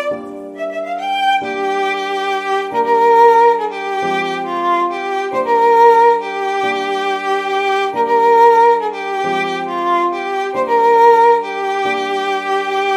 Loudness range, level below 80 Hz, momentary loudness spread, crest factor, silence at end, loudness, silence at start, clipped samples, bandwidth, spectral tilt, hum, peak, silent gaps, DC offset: 1 LU; -64 dBFS; 11 LU; 14 dB; 0 s; -14 LUFS; 0 s; under 0.1%; 13 kHz; -3.5 dB/octave; none; 0 dBFS; none; under 0.1%